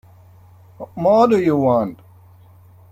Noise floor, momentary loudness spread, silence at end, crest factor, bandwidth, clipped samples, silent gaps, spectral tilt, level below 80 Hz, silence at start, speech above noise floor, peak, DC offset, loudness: -46 dBFS; 19 LU; 1 s; 16 dB; 16 kHz; under 0.1%; none; -8 dB/octave; -56 dBFS; 0.8 s; 31 dB; -4 dBFS; under 0.1%; -16 LUFS